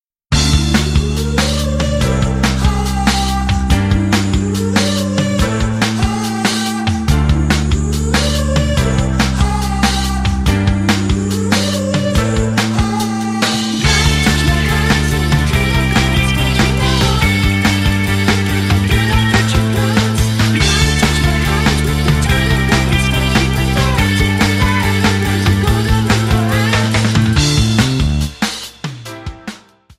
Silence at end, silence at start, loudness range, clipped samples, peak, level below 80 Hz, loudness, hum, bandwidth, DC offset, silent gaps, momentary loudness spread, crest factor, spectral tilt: 0.4 s; 0.3 s; 2 LU; under 0.1%; 0 dBFS; -20 dBFS; -14 LUFS; none; 16 kHz; under 0.1%; none; 4 LU; 14 dB; -5 dB/octave